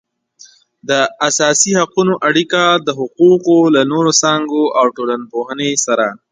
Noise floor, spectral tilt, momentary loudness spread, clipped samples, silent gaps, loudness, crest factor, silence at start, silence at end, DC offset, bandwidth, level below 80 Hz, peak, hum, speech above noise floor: -45 dBFS; -3 dB/octave; 8 LU; under 0.1%; none; -13 LUFS; 14 dB; 0.9 s; 0.15 s; under 0.1%; 9.6 kHz; -62 dBFS; 0 dBFS; none; 32 dB